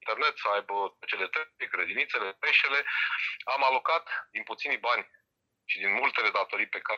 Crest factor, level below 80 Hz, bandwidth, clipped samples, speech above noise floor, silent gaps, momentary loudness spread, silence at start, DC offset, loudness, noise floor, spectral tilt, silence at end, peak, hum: 20 dB; -84 dBFS; 7.6 kHz; under 0.1%; 38 dB; none; 9 LU; 0.05 s; under 0.1%; -28 LUFS; -67 dBFS; -2 dB/octave; 0 s; -10 dBFS; none